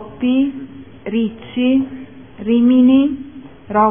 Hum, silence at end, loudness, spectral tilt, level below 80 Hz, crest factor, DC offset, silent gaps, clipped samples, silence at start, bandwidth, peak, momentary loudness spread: none; 0 s; -16 LUFS; -10.5 dB/octave; -50 dBFS; 14 dB; 0.5%; none; under 0.1%; 0 s; 3.6 kHz; -2 dBFS; 21 LU